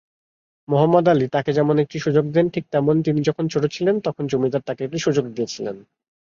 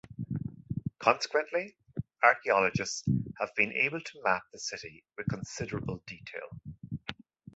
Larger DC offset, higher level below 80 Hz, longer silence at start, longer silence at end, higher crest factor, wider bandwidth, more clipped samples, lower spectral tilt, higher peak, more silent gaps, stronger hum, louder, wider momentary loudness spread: neither; about the same, -60 dBFS vs -58 dBFS; first, 0.7 s vs 0.1 s; first, 0.6 s vs 0.45 s; second, 18 dB vs 26 dB; second, 7.4 kHz vs 8.2 kHz; neither; first, -7 dB/octave vs -4.5 dB/octave; about the same, -4 dBFS vs -6 dBFS; neither; neither; first, -20 LUFS vs -31 LUFS; second, 10 LU vs 16 LU